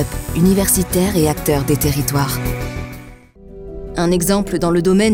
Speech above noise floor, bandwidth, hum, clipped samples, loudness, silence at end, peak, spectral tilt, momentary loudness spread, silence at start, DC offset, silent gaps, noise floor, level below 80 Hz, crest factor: 24 dB; 18 kHz; none; under 0.1%; -16 LUFS; 0 s; -4 dBFS; -5 dB/octave; 17 LU; 0 s; under 0.1%; none; -39 dBFS; -30 dBFS; 14 dB